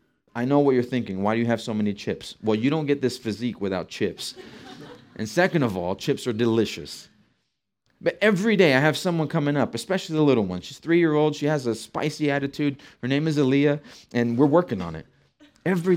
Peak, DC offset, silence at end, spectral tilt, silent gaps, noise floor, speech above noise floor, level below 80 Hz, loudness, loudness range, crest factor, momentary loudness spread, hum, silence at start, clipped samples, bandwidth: -4 dBFS; under 0.1%; 0 s; -6 dB/octave; none; -77 dBFS; 54 dB; -64 dBFS; -24 LUFS; 5 LU; 18 dB; 14 LU; none; 0.35 s; under 0.1%; 16 kHz